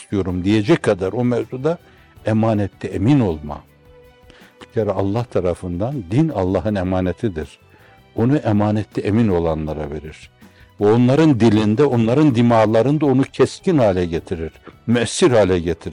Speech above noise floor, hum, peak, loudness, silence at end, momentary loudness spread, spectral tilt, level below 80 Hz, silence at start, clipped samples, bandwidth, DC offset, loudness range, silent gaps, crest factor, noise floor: 31 dB; none; -6 dBFS; -18 LUFS; 0 s; 14 LU; -7 dB/octave; -46 dBFS; 0 s; under 0.1%; 11 kHz; under 0.1%; 7 LU; none; 12 dB; -48 dBFS